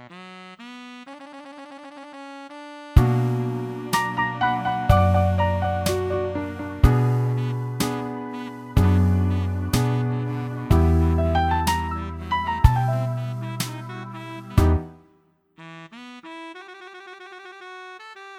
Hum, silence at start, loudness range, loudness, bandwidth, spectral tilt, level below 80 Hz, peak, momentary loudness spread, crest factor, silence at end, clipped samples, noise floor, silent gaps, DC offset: none; 0 s; 7 LU; -23 LUFS; 16 kHz; -6.5 dB/octave; -30 dBFS; 0 dBFS; 21 LU; 22 dB; 0 s; under 0.1%; -61 dBFS; none; under 0.1%